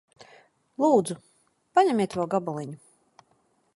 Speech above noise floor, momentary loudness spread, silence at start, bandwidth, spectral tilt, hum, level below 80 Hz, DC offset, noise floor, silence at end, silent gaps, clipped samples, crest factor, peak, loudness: 44 dB; 18 LU; 0.2 s; 11.5 kHz; -6 dB/octave; none; -72 dBFS; under 0.1%; -68 dBFS; 1 s; none; under 0.1%; 20 dB; -8 dBFS; -25 LUFS